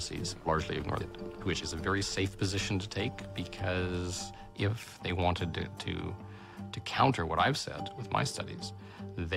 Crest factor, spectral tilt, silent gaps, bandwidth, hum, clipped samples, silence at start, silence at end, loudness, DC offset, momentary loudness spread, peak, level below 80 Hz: 24 dB; -4.5 dB/octave; none; 15 kHz; none; under 0.1%; 0 s; 0 s; -34 LUFS; under 0.1%; 13 LU; -10 dBFS; -52 dBFS